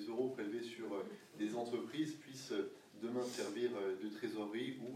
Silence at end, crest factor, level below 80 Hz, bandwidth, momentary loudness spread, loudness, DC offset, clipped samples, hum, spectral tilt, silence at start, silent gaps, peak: 0 s; 16 dB; under -90 dBFS; 15.5 kHz; 5 LU; -43 LUFS; under 0.1%; under 0.1%; none; -5 dB/octave; 0 s; none; -26 dBFS